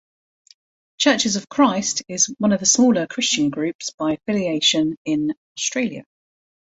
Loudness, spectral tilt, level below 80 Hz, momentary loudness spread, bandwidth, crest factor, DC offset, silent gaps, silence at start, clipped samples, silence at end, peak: -19 LUFS; -2.5 dB/octave; -62 dBFS; 9 LU; 8.2 kHz; 20 dB; under 0.1%; 3.75-3.79 s, 3.94-3.98 s, 4.97-5.05 s, 5.37-5.55 s; 1 s; under 0.1%; 0.7 s; -2 dBFS